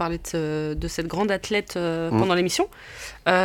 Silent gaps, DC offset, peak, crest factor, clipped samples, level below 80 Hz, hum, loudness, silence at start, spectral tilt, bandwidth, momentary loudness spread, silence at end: none; under 0.1%; -2 dBFS; 22 dB; under 0.1%; -42 dBFS; none; -25 LUFS; 0 s; -4.5 dB/octave; 17.5 kHz; 8 LU; 0 s